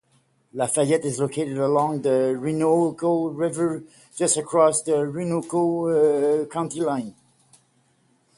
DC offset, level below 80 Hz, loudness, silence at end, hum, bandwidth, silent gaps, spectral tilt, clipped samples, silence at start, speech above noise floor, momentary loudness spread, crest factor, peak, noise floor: under 0.1%; -68 dBFS; -22 LUFS; 1.25 s; none; 11.5 kHz; none; -5.5 dB/octave; under 0.1%; 0.55 s; 42 dB; 8 LU; 18 dB; -6 dBFS; -64 dBFS